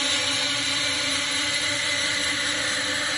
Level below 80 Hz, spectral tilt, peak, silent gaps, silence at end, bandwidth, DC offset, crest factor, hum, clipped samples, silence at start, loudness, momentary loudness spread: -58 dBFS; -0.5 dB/octave; -12 dBFS; none; 0 s; 11.5 kHz; under 0.1%; 14 dB; none; under 0.1%; 0 s; -22 LUFS; 1 LU